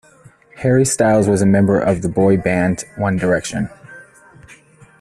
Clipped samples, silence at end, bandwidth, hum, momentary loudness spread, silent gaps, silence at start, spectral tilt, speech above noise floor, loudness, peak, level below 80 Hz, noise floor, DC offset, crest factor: under 0.1%; 1 s; 13 kHz; none; 8 LU; none; 0.55 s; -6 dB/octave; 32 dB; -16 LUFS; -2 dBFS; -46 dBFS; -47 dBFS; under 0.1%; 14 dB